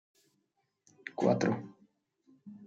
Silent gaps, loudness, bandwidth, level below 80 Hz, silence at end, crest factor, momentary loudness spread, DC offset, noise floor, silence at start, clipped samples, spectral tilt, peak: none; -32 LUFS; 7.8 kHz; -80 dBFS; 0 s; 22 dB; 24 LU; under 0.1%; -80 dBFS; 1.05 s; under 0.1%; -6.5 dB/octave; -14 dBFS